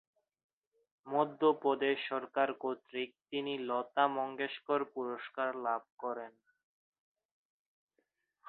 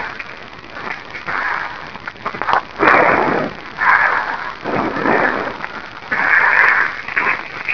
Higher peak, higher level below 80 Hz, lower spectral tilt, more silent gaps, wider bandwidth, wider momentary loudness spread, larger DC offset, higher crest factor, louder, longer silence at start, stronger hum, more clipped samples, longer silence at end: second, -14 dBFS vs 0 dBFS; second, -88 dBFS vs -48 dBFS; second, -2 dB/octave vs -5 dB/octave; first, 5.92-5.98 s vs none; second, 4.4 kHz vs 5.4 kHz; second, 11 LU vs 17 LU; second, under 0.1% vs 1%; about the same, 22 dB vs 18 dB; second, -35 LUFS vs -15 LUFS; first, 1.05 s vs 0 s; neither; neither; first, 2.2 s vs 0 s